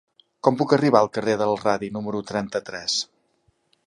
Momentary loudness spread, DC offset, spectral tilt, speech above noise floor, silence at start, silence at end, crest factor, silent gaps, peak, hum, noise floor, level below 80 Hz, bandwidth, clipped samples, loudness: 10 LU; under 0.1%; -4.5 dB/octave; 45 dB; 0.45 s; 0.8 s; 22 dB; none; -2 dBFS; none; -67 dBFS; -62 dBFS; 11.5 kHz; under 0.1%; -23 LUFS